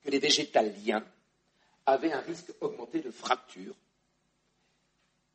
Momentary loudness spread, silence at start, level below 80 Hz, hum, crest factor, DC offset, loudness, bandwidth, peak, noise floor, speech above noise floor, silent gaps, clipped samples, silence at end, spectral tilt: 16 LU; 0.05 s; -80 dBFS; 60 Hz at -75 dBFS; 22 dB; under 0.1%; -30 LUFS; 8.4 kHz; -12 dBFS; -75 dBFS; 44 dB; none; under 0.1%; 1.6 s; -2.5 dB/octave